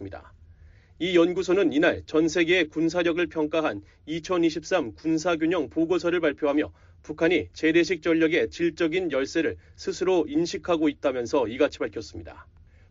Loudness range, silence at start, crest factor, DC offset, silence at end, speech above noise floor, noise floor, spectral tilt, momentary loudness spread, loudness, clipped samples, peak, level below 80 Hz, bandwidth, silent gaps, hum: 2 LU; 0 s; 16 dB; under 0.1%; 0.5 s; 27 dB; -52 dBFS; -4 dB/octave; 11 LU; -25 LUFS; under 0.1%; -10 dBFS; -54 dBFS; 7.6 kHz; none; none